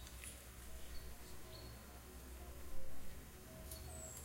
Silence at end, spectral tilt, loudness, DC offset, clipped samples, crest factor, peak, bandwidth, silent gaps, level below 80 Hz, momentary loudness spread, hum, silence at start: 0 s; -3.5 dB/octave; -54 LUFS; under 0.1%; under 0.1%; 16 dB; -30 dBFS; 16 kHz; none; -56 dBFS; 5 LU; none; 0 s